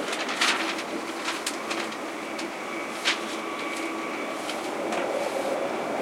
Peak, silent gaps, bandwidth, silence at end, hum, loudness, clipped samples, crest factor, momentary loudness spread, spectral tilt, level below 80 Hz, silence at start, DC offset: -8 dBFS; none; 16.5 kHz; 0 s; none; -29 LUFS; under 0.1%; 20 dB; 8 LU; -2 dB/octave; -74 dBFS; 0 s; under 0.1%